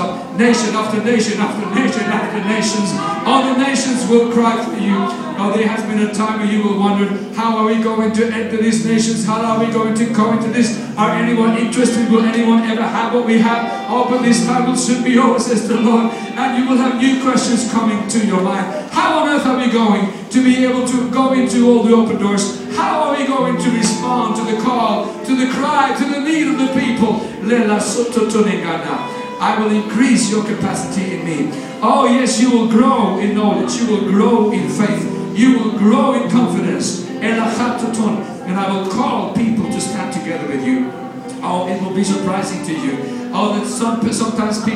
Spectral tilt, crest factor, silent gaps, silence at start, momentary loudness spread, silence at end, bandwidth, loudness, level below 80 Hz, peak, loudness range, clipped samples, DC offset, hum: -5 dB/octave; 14 dB; none; 0 s; 7 LU; 0 s; 12.5 kHz; -15 LUFS; -56 dBFS; 0 dBFS; 4 LU; under 0.1%; under 0.1%; none